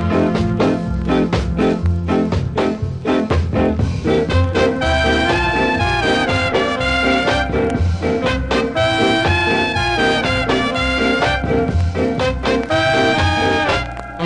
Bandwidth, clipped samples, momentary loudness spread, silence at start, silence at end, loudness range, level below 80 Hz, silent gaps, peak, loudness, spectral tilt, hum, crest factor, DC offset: 10.5 kHz; under 0.1%; 4 LU; 0 s; 0 s; 2 LU; -26 dBFS; none; -4 dBFS; -16 LUFS; -6 dB/octave; none; 12 dB; under 0.1%